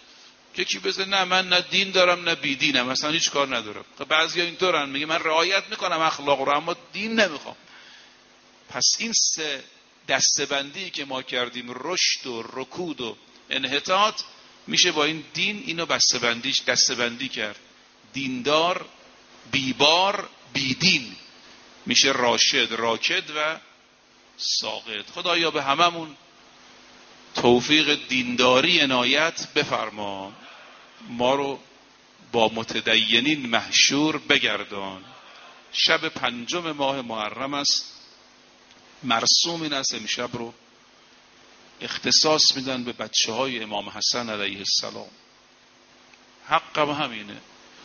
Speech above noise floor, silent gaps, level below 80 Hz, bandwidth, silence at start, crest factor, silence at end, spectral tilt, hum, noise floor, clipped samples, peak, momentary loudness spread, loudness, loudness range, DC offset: 32 dB; none; -66 dBFS; 7 kHz; 0.55 s; 24 dB; 0 s; -0.5 dB/octave; none; -56 dBFS; under 0.1%; 0 dBFS; 15 LU; -22 LUFS; 5 LU; under 0.1%